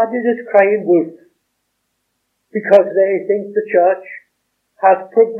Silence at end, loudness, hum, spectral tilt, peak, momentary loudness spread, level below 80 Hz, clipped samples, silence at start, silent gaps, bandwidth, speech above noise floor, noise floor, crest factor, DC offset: 0 s; -15 LUFS; none; -8.5 dB/octave; 0 dBFS; 13 LU; -74 dBFS; 0.1%; 0 s; none; 5.2 kHz; 56 dB; -70 dBFS; 16 dB; under 0.1%